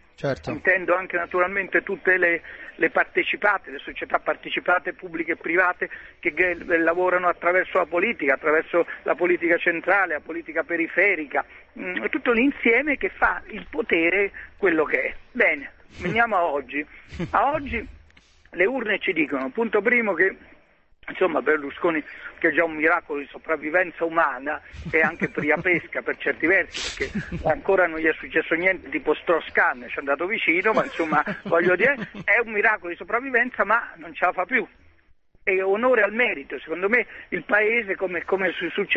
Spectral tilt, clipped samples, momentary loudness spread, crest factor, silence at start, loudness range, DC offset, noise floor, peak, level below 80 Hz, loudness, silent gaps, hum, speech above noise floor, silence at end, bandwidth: -5.5 dB/octave; under 0.1%; 10 LU; 20 dB; 0.2 s; 3 LU; under 0.1%; -56 dBFS; -4 dBFS; -52 dBFS; -22 LUFS; none; none; 33 dB; 0 s; 8.4 kHz